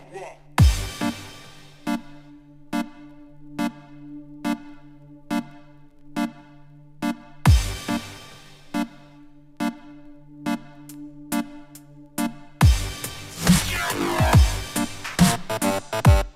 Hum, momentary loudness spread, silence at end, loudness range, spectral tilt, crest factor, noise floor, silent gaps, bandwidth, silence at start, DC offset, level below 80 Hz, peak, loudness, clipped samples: none; 22 LU; 0.05 s; 12 LU; -5 dB/octave; 20 dB; -47 dBFS; none; 16 kHz; 0.1 s; under 0.1%; -30 dBFS; -4 dBFS; -24 LUFS; under 0.1%